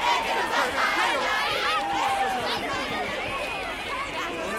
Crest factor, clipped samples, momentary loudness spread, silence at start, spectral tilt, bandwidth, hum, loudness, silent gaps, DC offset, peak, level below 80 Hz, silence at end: 16 dB; under 0.1%; 6 LU; 0 s; -2 dB/octave; 16.5 kHz; none; -25 LUFS; none; under 0.1%; -10 dBFS; -52 dBFS; 0 s